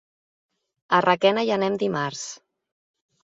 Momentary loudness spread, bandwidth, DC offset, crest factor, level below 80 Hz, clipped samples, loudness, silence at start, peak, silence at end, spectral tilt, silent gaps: 12 LU; 8 kHz; under 0.1%; 22 dB; -70 dBFS; under 0.1%; -22 LUFS; 0.9 s; -4 dBFS; 0.85 s; -4.5 dB/octave; none